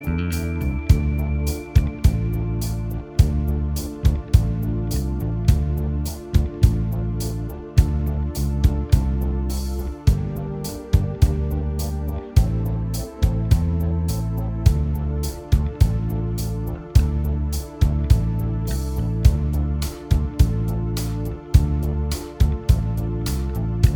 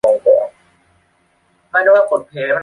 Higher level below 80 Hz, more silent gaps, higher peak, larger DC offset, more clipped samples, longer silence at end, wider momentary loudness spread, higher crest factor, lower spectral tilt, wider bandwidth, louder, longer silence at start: first, -24 dBFS vs -60 dBFS; neither; about the same, 0 dBFS vs -2 dBFS; neither; neither; about the same, 0 s vs 0 s; about the same, 7 LU vs 8 LU; first, 20 dB vs 14 dB; first, -7 dB/octave vs -5 dB/octave; first, over 20 kHz vs 11 kHz; second, -22 LUFS vs -14 LUFS; about the same, 0 s vs 0.05 s